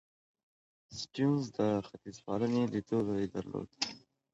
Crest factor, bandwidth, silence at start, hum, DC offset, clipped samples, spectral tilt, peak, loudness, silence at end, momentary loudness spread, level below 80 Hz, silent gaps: 18 dB; 8.2 kHz; 0.9 s; none; under 0.1%; under 0.1%; -6 dB/octave; -16 dBFS; -34 LUFS; 0.35 s; 15 LU; -66 dBFS; none